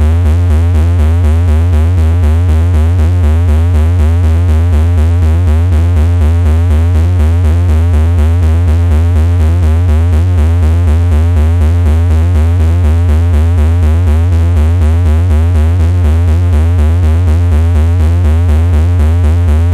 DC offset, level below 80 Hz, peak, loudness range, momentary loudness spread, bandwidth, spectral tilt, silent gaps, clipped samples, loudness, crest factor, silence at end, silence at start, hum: under 0.1%; -10 dBFS; -2 dBFS; 0 LU; 0 LU; 7.8 kHz; -8 dB/octave; none; under 0.1%; -9 LUFS; 6 dB; 0 s; 0 s; none